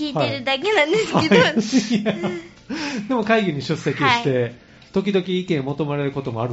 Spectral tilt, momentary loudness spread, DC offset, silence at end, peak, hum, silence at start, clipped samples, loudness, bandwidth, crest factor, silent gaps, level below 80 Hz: -4 dB/octave; 10 LU; under 0.1%; 0 s; -2 dBFS; none; 0 s; under 0.1%; -20 LUFS; 8 kHz; 18 dB; none; -56 dBFS